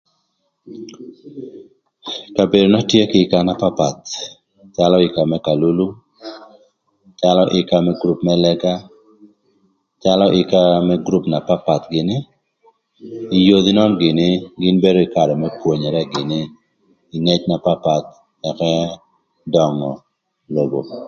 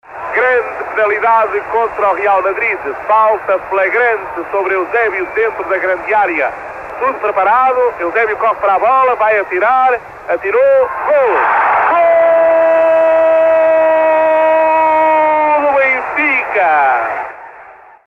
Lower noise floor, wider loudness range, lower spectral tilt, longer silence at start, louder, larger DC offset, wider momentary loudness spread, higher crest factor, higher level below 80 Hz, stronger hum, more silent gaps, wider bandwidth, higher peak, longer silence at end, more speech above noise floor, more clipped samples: first, -68 dBFS vs -38 dBFS; about the same, 4 LU vs 4 LU; about the same, -6.5 dB/octave vs -5.5 dB/octave; first, 0.65 s vs 0.1 s; second, -16 LUFS vs -12 LUFS; neither; first, 21 LU vs 7 LU; first, 18 dB vs 10 dB; about the same, -50 dBFS vs -52 dBFS; neither; neither; first, 7.2 kHz vs 6 kHz; about the same, 0 dBFS vs -2 dBFS; second, 0 s vs 0.35 s; first, 52 dB vs 25 dB; neither